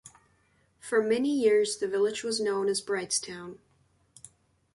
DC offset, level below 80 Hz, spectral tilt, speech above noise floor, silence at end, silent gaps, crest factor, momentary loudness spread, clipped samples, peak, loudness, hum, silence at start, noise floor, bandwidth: under 0.1%; -72 dBFS; -3 dB/octave; 40 dB; 1.2 s; none; 16 dB; 16 LU; under 0.1%; -14 dBFS; -27 LUFS; none; 0.05 s; -68 dBFS; 11.5 kHz